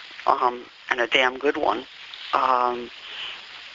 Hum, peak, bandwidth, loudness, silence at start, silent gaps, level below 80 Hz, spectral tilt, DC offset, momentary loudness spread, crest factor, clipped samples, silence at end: none; -2 dBFS; 7.8 kHz; -23 LUFS; 0 s; none; -62 dBFS; 1 dB/octave; under 0.1%; 16 LU; 24 dB; under 0.1%; 0 s